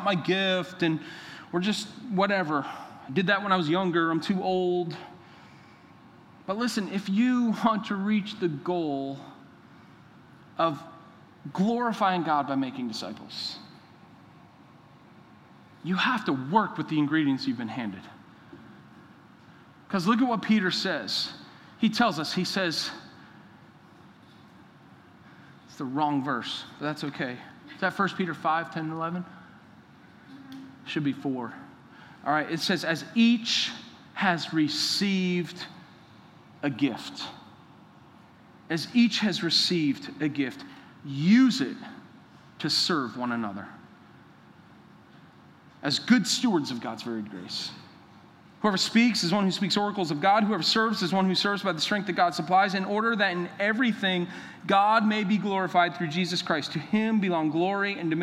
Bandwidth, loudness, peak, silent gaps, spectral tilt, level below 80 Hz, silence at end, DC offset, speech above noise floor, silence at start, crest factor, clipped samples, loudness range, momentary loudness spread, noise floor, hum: 15 kHz; -27 LUFS; -6 dBFS; none; -4.5 dB/octave; -76 dBFS; 0 s; under 0.1%; 27 dB; 0 s; 22 dB; under 0.1%; 9 LU; 15 LU; -53 dBFS; none